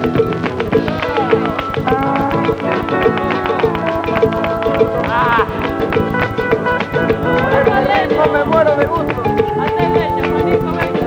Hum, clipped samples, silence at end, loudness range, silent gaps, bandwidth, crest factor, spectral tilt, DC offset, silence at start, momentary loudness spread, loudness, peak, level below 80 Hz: none; under 0.1%; 0 s; 2 LU; none; 16 kHz; 14 dB; -7.5 dB/octave; under 0.1%; 0 s; 4 LU; -15 LUFS; 0 dBFS; -36 dBFS